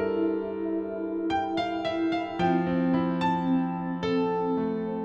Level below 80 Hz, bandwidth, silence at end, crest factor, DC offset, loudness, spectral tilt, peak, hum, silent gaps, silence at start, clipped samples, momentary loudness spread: -58 dBFS; 7.8 kHz; 0 s; 14 dB; under 0.1%; -28 LUFS; -8 dB/octave; -12 dBFS; none; none; 0 s; under 0.1%; 5 LU